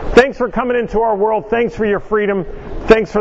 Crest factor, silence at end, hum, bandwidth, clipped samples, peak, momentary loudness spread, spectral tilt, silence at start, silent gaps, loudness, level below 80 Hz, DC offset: 14 dB; 0 s; none; 8.2 kHz; 0.4%; 0 dBFS; 7 LU; -6 dB/octave; 0 s; none; -15 LUFS; -30 dBFS; under 0.1%